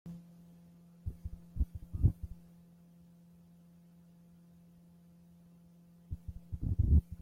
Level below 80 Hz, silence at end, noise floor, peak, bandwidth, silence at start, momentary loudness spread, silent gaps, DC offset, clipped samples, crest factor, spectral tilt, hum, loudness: -42 dBFS; 0.05 s; -60 dBFS; -16 dBFS; 1.4 kHz; 0.05 s; 30 LU; none; under 0.1%; under 0.1%; 22 dB; -10.5 dB/octave; none; -37 LUFS